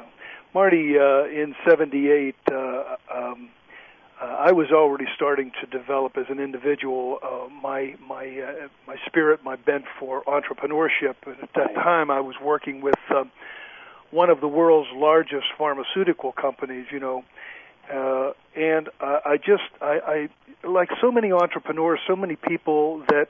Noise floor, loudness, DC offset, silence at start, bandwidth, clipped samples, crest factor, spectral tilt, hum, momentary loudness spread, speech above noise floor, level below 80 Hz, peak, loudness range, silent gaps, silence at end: -48 dBFS; -23 LUFS; under 0.1%; 0 s; 4.9 kHz; under 0.1%; 18 dB; -7.5 dB/octave; none; 15 LU; 26 dB; -70 dBFS; -4 dBFS; 5 LU; none; 0.05 s